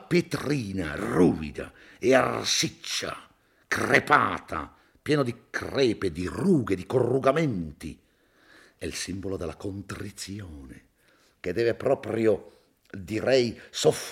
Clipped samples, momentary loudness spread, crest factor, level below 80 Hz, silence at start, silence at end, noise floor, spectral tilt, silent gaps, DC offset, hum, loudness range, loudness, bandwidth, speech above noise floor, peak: under 0.1%; 16 LU; 22 dB; -56 dBFS; 0 s; 0 s; -63 dBFS; -4.5 dB/octave; none; under 0.1%; none; 10 LU; -26 LUFS; 16.5 kHz; 37 dB; -4 dBFS